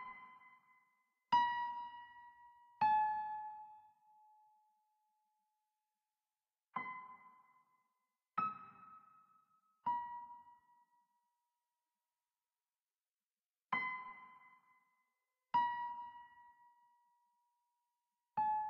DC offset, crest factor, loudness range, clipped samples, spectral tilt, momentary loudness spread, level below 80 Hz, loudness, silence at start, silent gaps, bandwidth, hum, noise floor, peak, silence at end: under 0.1%; 22 dB; 15 LU; under 0.1%; -0.5 dB/octave; 25 LU; -86 dBFS; -40 LUFS; 0 s; 13.11-13.15 s, 13.23-13.30 s, 13.46-13.54 s; 6 kHz; none; under -90 dBFS; -24 dBFS; 0 s